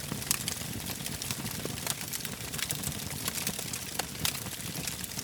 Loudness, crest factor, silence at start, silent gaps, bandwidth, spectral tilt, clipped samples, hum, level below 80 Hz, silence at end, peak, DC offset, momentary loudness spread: -33 LUFS; 30 dB; 0 s; none; over 20 kHz; -2 dB/octave; under 0.1%; none; -54 dBFS; 0 s; -6 dBFS; under 0.1%; 5 LU